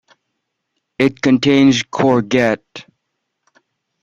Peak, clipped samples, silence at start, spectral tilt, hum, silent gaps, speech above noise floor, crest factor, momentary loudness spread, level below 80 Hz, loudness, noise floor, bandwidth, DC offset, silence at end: -2 dBFS; under 0.1%; 1 s; -5.5 dB/octave; none; none; 60 dB; 16 dB; 13 LU; -54 dBFS; -14 LUFS; -74 dBFS; 7.6 kHz; under 0.1%; 1.2 s